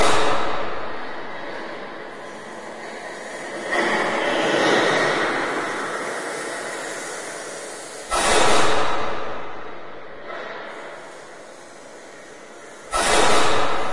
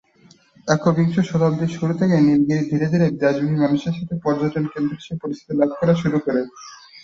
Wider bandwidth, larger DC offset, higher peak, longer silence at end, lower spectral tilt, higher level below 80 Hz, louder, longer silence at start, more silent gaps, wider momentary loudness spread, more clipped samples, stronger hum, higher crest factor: first, 11.5 kHz vs 7.6 kHz; neither; about the same, -2 dBFS vs -2 dBFS; about the same, 0 s vs 0.05 s; second, -2.5 dB/octave vs -7.5 dB/octave; first, -46 dBFS vs -54 dBFS; about the same, -22 LUFS vs -20 LUFS; second, 0 s vs 0.65 s; neither; first, 22 LU vs 11 LU; neither; neither; about the same, 18 dB vs 18 dB